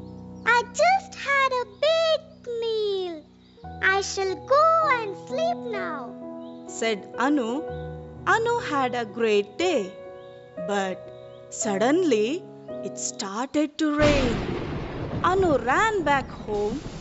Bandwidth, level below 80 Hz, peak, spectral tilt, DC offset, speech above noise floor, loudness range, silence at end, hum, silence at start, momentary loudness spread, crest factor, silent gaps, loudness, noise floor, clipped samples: 8 kHz; -44 dBFS; -8 dBFS; -3 dB/octave; under 0.1%; 22 dB; 3 LU; 0 s; none; 0 s; 16 LU; 18 dB; none; -24 LUFS; -46 dBFS; under 0.1%